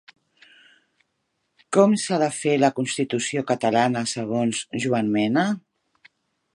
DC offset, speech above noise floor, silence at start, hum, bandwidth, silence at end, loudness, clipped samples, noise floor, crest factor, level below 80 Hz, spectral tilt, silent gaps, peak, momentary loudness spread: under 0.1%; 53 dB; 1.7 s; none; 11.5 kHz; 0.95 s; -22 LUFS; under 0.1%; -75 dBFS; 20 dB; -68 dBFS; -5 dB/octave; none; -2 dBFS; 7 LU